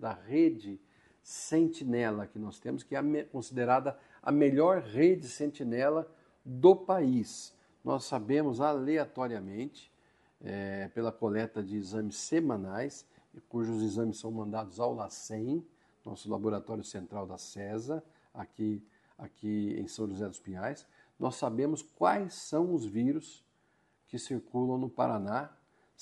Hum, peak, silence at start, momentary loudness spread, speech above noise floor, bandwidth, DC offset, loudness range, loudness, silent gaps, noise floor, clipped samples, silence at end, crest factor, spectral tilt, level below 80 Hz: none; -10 dBFS; 0 s; 16 LU; 40 dB; 11.5 kHz; under 0.1%; 9 LU; -33 LUFS; none; -72 dBFS; under 0.1%; 0.55 s; 24 dB; -6 dB/octave; -74 dBFS